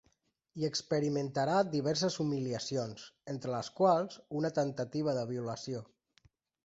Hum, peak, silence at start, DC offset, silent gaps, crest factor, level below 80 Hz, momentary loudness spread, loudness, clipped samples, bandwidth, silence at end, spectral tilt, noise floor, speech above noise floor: none; -16 dBFS; 0.55 s; under 0.1%; none; 20 dB; -72 dBFS; 12 LU; -34 LUFS; under 0.1%; 8 kHz; 0.8 s; -5.5 dB/octave; -75 dBFS; 42 dB